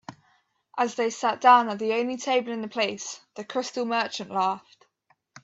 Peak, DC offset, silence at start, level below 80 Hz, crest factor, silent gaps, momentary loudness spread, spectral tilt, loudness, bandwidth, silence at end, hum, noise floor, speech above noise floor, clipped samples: -6 dBFS; under 0.1%; 0.1 s; -78 dBFS; 20 dB; none; 18 LU; -3 dB/octave; -25 LUFS; 8 kHz; 0.05 s; none; -69 dBFS; 44 dB; under 0.1%